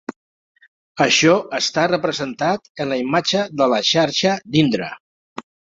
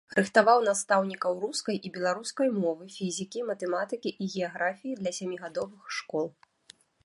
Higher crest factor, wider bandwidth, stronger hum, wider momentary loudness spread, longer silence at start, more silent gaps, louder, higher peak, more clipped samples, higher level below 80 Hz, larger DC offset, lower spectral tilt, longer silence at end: about the same, 18 dB vs 22 dB; second, 7.8 kHz vs 11.5 kHz; neither; first, 22 LU vs 12 LU; about the same, 0.1 s vs 0.1 s; first, 0.16-0.55 s, 0.68-0.95 s, 2.69-2.75 s, 5.00-5.36 s vs none; first, -18 LUFS vs -29 LUFS; first, -2 dBFS vs -6 dBFS; neither; first, -60 dBFS vs -76 dBFS; neither; about the same, -4 dB/octave vs -4 dB/octave; second, 0.35 s vs 0.75 s